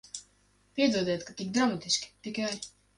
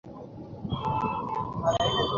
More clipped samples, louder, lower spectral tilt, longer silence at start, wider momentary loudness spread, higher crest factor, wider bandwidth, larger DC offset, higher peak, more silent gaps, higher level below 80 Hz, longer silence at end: neither; about the same, -30 LUFS vs -29 LUFS; second, -3.5 dB/octave vs -5.5 dB/octave; about the same, 0.15 s vs 0.05 s; second, 13 LU vs 17 LU; about the same, 20 dB vs 16 dB; first, 11.5 kHz vs 7.4 kHz; neither; about the same, -12 dBFS vs -14 dBFS; neither; second, -68 dBFS vs -48 dBFS; first, 0.3 s vs 0 s